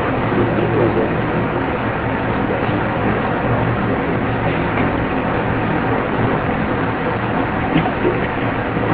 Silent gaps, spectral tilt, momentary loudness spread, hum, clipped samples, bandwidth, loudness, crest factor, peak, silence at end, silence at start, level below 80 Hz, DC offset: none; -11 dB/octave; 3 LU; none; under 0.1%; 4.9 kHz; -18 LUFS; 16 dB; -2 dBFS; 0 s; 0 s; -34 dBFS; under 0.1%